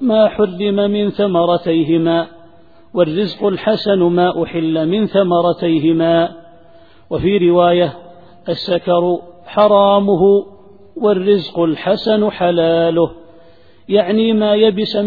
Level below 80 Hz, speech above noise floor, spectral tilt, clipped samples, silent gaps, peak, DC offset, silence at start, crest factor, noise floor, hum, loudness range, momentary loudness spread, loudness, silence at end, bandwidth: -48 dBFS; 33 dB; -9 dB/octave; under 0.1%; none; 0 dBFS; 0.5%; 0 s; 14 dB; -47 dBFS; none; 2 LU; 7 LU; -15 LUFS; 0 s; 4.9 kHz